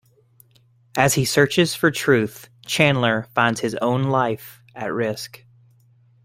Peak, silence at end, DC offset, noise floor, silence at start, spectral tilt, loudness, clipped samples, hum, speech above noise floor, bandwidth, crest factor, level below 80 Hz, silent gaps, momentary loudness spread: 0 dBFS; 1 s; under 0.1%; -57 dBFS; 0.95 s; -4.5 dB/octave; -20 LUFS; under 0.1%; none; 37 dB; 16 kHz; 20 dB; -56 dBFS; none; 15 LU